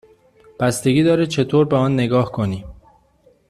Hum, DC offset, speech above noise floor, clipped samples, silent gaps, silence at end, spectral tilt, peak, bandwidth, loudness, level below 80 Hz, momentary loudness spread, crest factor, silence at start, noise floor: none; under 0.1%; 39 dB; under 0.1%; none; 0.75 s; -6.5 dB/octave; -4 dBFS; 14 kHz; -18 LUFS; -48 dBFS; 8 LU; 16 dB; 0.6 s; -56 dBFS